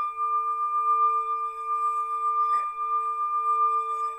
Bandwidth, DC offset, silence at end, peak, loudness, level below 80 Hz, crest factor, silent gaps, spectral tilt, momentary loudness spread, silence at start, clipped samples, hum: 10 kHz; under 0.1%; 0 s; -16 dBFS; -25 LUFS; -70 dBFS; 10 dB; none; -1 dB/octave; 5 LU; 0 s; under 0.1%; none